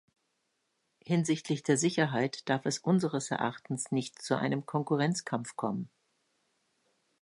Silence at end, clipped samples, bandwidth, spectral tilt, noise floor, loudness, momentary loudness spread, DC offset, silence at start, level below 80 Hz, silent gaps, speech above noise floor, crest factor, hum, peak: 1.35 s; under 0.1%; 11.5 kHz; -5 dB/octave; -79 dBFS; -31 LUFS; 7 LU; under 0.1%; 1.05 s; -76 dBFS; none; 48 dB; 20 dB; none; -12 dBFS